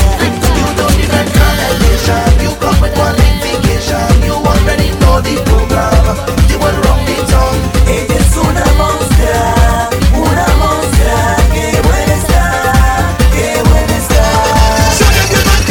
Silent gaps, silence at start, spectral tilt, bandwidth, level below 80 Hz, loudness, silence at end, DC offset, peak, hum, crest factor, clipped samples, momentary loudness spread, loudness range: none; 0 s; -5 dB/octave; 17.5 kHz; -12 dBFS; -10 LUFS; 0 s; under 0.1%; 0 dBFS; none; 8 dB; 0.1%; 3 LU; 1 LU